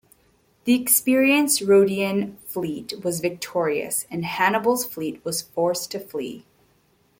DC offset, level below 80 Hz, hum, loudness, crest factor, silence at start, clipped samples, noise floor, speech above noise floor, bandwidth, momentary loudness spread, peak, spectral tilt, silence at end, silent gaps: under 0.1%; -64 dBFS; none; -22 LUFS; 18 dB; 0.65 s; under 0.1%; -62 dBFS; 40 dB; 17 kHz; 13 LU; -4 dBFS; -3.5 dB/octave; 0.8 s; none